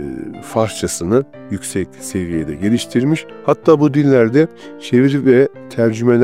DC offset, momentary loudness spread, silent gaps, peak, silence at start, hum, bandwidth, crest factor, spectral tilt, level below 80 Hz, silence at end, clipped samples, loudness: 0.4%; 11 LU; none; 0 dBFS; 0 s; none; 16 kHz; 14 dB; -6.5 dB/octave; -48 dBFS; 0 s; under 0.1%; -16 LUFS